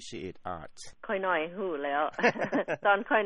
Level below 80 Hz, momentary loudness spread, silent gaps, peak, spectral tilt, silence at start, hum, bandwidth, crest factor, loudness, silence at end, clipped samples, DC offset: -64 dBFS; 14 LU; none; -10 dBFS; -4.5 dB/octave; 0 s; none; 10 kHz; 20 dB; -29 LUFS; 0 s; under 0.1%; under 0.1%